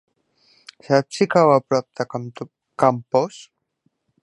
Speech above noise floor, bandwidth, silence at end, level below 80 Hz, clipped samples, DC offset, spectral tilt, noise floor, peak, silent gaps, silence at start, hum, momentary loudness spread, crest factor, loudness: 50 dB; 11 kHz; 0.8 s; -70 dBFS; under 0.1%; under 0.1%; -6 dB/octave; -69 dBFS; -2 dBFS; none; 0.9 s; none; 17 LU; 20 dB; -20 LUFS